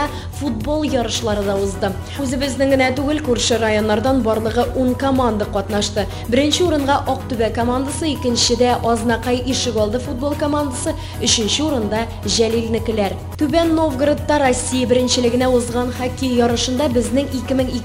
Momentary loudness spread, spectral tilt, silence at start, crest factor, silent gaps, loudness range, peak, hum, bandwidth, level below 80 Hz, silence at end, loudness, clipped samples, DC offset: 6 LU; -4.5 dB/octave; 0 s; 16 dB; none; 2 LU; -2 dBFS; none; 16 kHz; -34 dBFS; 0 s; -18 LUFS; under 0.1%; under 0.1%